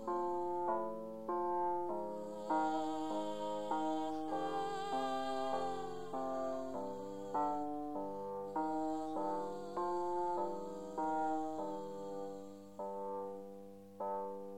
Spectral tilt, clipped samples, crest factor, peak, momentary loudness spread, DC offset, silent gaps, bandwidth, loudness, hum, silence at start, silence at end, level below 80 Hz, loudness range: -5.5 dB/octave; under 0.1%; 16 dB; -24 dBFS; 8 LU; 0.3%; none; 16 kHz; -40 LUFS; none; 0 s; 0 s; -72 dBFS; 3 LU